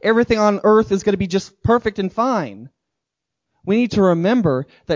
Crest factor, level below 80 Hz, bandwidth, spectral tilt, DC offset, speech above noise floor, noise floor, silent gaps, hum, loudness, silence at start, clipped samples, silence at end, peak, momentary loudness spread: 14 dB; -44 dBFS; 7.6 kHz; -6.5 dB/octave; under 0.1%; 64 dB; -81 dBFS; none; none; -17 LUFS; 0.05 s; under 0.1%; 0 s; -2 dBFS; 8 LU